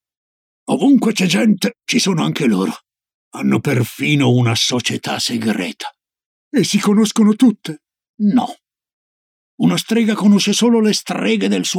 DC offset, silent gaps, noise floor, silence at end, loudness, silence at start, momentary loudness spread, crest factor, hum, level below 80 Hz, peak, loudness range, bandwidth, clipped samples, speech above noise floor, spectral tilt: under 0.1%; 3.14-3.31 s, 6.26-6.51 s, 8.09-8.18 s, 8.93-9.58 s; under -90 dBFS; 0 s; -16 LUFS; 0.7 s; 11 LU; 14 dB; none; -66 dBFS; -2 dBFS; 1 LU; 16 kHz; under 0.1%; over 75 dB; -5 dB/octave